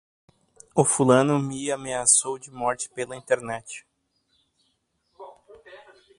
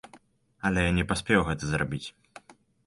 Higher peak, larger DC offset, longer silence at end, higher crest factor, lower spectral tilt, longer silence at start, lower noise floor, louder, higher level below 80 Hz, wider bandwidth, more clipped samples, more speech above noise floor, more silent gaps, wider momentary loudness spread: first, -2 dBFS vs -8 dBFS; neither; about the same, 0.4 s vs 0.35 s; about the same, 24 dB vs 20 dB; second, -4 dB/octave vs -5.5 dB/octave; first, 0.75 s vs 0.15 s; first, -72 dBFS vs -58 dBFS; first, -23 LUFS vs -27 LUFS; second, -64 dBFS vs -44 dBFS; about the same, 11.5 kHz vs 11.5 kHz; neither; first, 49 dB vs 31 dB; neither; first, 16 LU vs 9 LU